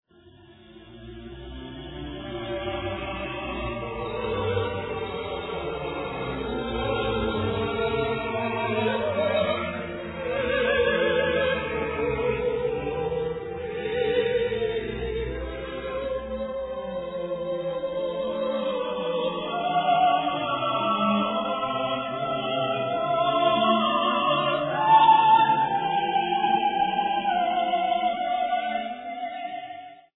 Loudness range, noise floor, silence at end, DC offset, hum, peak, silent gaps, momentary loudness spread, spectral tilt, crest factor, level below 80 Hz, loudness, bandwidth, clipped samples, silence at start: 10 LU; -52 dBFS; 0.15 s; under 0.1%; none; -8 dBFS; none; 11 LU; -9 dB/octave; 18 dB; -46 dBFS; -25 LUFS; 4.1 kHz; under 0.1%; 0.25 s